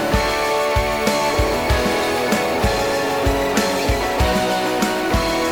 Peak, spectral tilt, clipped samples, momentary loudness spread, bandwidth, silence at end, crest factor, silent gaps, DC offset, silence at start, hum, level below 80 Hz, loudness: -2 dBFS; -4.5 dB/octave; under 0.1%; 1 LU; over 20 kHz; 0 s; 16 dB; none; under 0.1%; 0 s; none; -28 dBFS; -18 LUFS